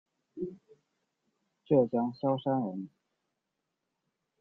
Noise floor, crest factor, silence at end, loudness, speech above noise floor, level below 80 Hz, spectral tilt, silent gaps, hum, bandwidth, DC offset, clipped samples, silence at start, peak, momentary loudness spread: -85 dBFS; 20 dB; 1.55 s; -31 LUFS; 56 dB; -76 dBFS; -10.5 dB/octave; none; none; 4.5 kHz; under 0.1%; under 0.1%; 0.35 s; -14 dBFS; 17 LU